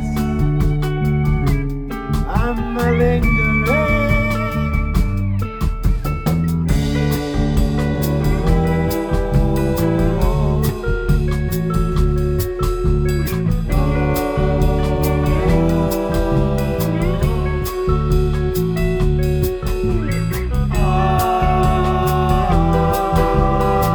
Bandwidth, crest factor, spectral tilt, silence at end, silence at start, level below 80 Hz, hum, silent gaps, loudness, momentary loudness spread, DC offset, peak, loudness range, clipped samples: over 20 kHz; 14 dB; -7 dB/octave; 0 s; 0 s; -22 dBFS; none; none; -18 LUFS; 5 LU; under 0.1%; -2 dBFS; 2 LU; under 0.1%